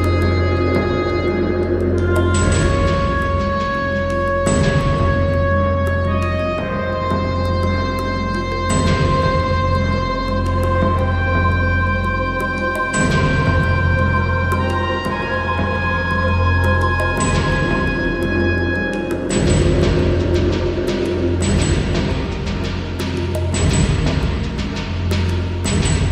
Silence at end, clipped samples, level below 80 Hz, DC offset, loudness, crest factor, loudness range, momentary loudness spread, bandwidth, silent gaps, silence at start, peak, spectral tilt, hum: 0 s; under 0.1%; -26 dBFS; under 0.1%; -18 LUFS; 14 dB; 2 LU; 5 LU; 11 kHz; none; 0 s; -2 dBFS; -6 dB/octave; none